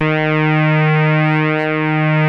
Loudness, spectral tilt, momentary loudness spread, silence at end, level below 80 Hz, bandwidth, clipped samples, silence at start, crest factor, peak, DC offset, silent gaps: -14 LUFS; -9 dB/octave; 3 LU; 0 s; -60 dBFS; 5.4 kHz; under 0.1%; 0 s; 10 dB; -4 dBFS; under 0.1%; none